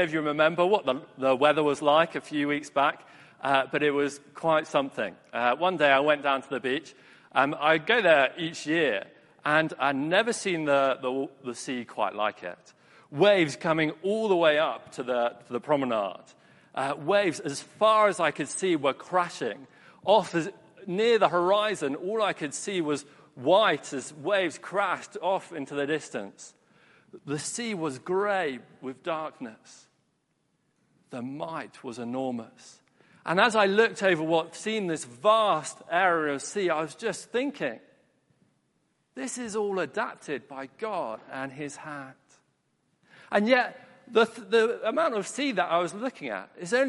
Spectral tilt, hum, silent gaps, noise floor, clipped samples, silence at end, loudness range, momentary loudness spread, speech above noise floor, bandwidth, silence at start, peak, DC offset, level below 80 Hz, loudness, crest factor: -4 dB/octave; none; none; -74 dBFS; under 0.1%; 0 s; 9 LU; 14 LU; 47 dB; 11.5 kHz; 0 s; -6 dBFS; under 0.1%; -76 dBFS; -27 LUFS; 22 dB